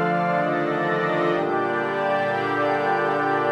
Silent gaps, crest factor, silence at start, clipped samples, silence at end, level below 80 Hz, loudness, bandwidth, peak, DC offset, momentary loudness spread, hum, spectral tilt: none; 12 dB; 0 s; under 0.1%; 0 s; -66 dBFS; -22 LUFS; 11.5 kHz; -10 dBFS; under 0.1%; 1 LU; none; -7 dB/octave